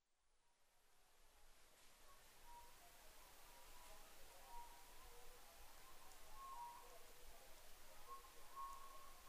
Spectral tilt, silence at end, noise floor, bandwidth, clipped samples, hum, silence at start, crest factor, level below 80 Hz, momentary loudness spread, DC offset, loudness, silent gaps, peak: -1.5 dB/octave; 0 s; -80 dBFS; 15.5 kHz; under 0.1%; none; 0.1 s; 18 dB; -66 dBFS; 9 LU; under 0.1%; -62 LUFS; none; -42 dBFS